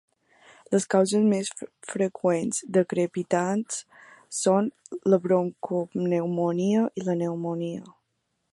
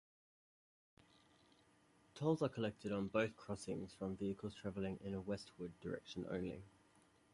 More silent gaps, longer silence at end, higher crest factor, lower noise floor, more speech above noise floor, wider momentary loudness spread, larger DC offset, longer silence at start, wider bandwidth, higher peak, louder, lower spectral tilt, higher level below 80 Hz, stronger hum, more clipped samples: neither; about the same, 0.6 s vs 0.65 s; about the same, 18 dB vs 20 dB; first, -77 dBFS vs -73 dBFS; first, 52 dB vs 29 dB; about the same, 11 LU vs 10 LU; neither; second, 0.7 s vs 2.15 s; about the same, 11.5 kHz vs 11.5 kHz; first, -8 dBFS vs -24 dBFS; first, -26 LUFS vs -44 LUFS; about the same, -5.5 dB/octave vs -6.5 dB/octave; about the same, -74 dBFS vs -70 dBFS; neither; neither